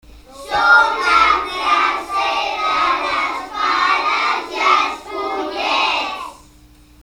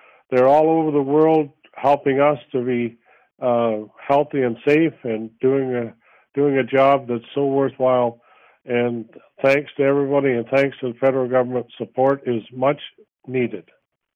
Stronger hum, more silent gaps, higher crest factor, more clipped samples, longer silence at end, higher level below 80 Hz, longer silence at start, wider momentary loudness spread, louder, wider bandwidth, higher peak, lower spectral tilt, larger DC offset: neither; neither; about the same, 18 dB vs 14 dB; neither; first, 0.7 s vs 0.55 s; first, -48 dBFS vs -66 dBFS; second, 0.1 s vs 0.3 s; about the same, 11 LU vs 11 LU; first, -16 LUFS vs -20 LUFS; first, 19 kHz vs 7.6 kHz; first, 0 dBFS vs -6 dBFS; second, -1.5 dB/octave vs -8 dB/octave; neither